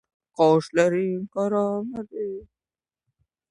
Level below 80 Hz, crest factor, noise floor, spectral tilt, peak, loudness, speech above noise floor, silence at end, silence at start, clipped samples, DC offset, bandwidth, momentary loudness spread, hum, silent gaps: -64 dBFS; 20 dB; under -90 dBFS; -6.5 dB/octave; -6 dBFS; -24 LUFS; over 67 dB; 1.05 s; 0.4 s; under 0.1%; under 0.1%; 11 kHz; 13 LU; none; none